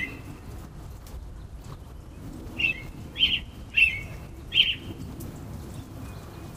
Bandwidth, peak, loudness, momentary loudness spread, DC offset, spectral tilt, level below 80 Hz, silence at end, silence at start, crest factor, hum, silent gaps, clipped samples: 15.5 kHz; -6 dBFS; -24 LUFS; 22 LU; under 0.1%; -3.5 dB/octave; -44 dBFS; 0 s; 0 s; 24 dB; none; none; under 0.1%